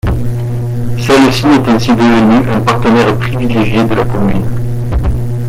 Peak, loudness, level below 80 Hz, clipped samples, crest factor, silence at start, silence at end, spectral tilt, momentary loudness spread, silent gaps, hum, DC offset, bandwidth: 0 dBFS; -11 LUFS; -24 dBFS; under 0.1%; 10 dB; 0.05 s; 0 s; -6.5 dB/octave; 9 LU; none; none; under 0.1%; 15.5 kHz